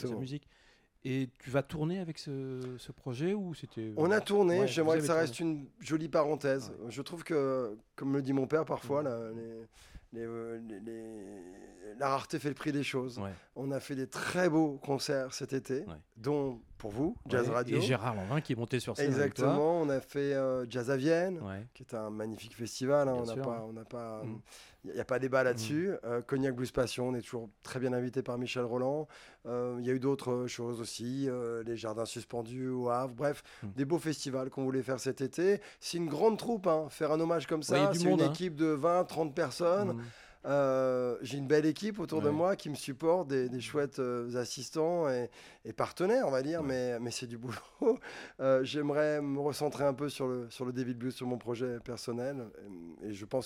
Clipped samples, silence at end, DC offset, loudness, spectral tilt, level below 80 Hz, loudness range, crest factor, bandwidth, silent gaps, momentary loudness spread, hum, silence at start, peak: under 0.1%; 0 s; under 0.1%; -34 LUFS; -6 dB/octave; -66 dBFS; 6 LU; 18 dB; 16 kHz; none; 14 LU; none; 0 s; -16 dBFS